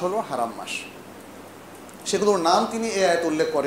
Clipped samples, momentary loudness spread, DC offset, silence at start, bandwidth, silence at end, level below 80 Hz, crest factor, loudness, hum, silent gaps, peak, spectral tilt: under 0.1%; 22 LU; under 0.1%; 0 s; 16 kHz; 0 s; -66 dBFS; 20 dB; -23 LUFS; none; none; -4 dBFS; -3.5 dB/octave